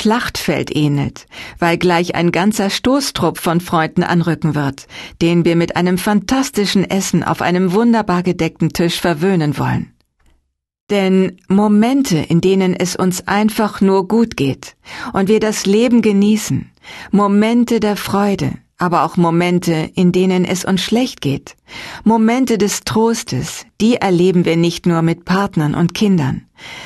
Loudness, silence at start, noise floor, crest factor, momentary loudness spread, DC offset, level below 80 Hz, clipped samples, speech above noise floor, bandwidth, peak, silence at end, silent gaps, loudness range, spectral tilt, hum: -15 LUFS; 0 s; -60 dBFS; 14 dB; 9 LU; under 0.1%; -44 dBFS; under 0.1%; 46 dB; 13 kHz; -2 dBFS; 0 s; 10.81-10.87 s; 2 LU; -5.5 dB/octave; none